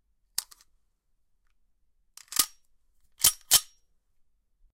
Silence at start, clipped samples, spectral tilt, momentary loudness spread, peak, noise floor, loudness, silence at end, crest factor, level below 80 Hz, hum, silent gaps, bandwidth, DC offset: 0.4 s; under 0.1%; 2 dB/octave; 14 LU; -6 dBFS; -71 dBFS; -25 LUFS; 1.15 s; 26 dB; -62 dBFS; none; none; 16 kHz; under 0.1%